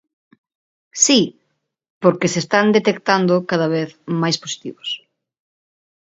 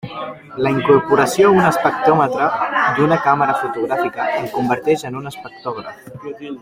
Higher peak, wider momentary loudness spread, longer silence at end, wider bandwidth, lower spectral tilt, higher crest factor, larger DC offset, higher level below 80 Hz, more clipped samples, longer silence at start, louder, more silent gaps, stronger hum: about the same, 0 dBFS vs -2 dBFS; second, 14 LU vs 17 LU; first, 1.15 s vs 0 s; second, 8 kHz vs 16 kHz; second, -3.5 dB/octave vs -6 dB/octave; about the same, 20 dB vs 16 dB; neither; second, -64 dBFS vs -54 dBFS; neither; first, 0.95 s vs 0.05 s; about the same, -18 LUFS vs -16 LUFS; first, 1.90-2.01 s vs none; neither